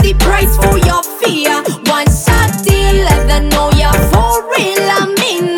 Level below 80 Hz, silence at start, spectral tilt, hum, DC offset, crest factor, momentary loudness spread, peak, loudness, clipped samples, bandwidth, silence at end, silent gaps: -14 dBFS; 0 s; -4.5 dB/octave; none; under 0.1%; 10 dB; 3 LU; 0 dBFS; -11 LUFS; under 0.1%; 20 kHz; 0 s; none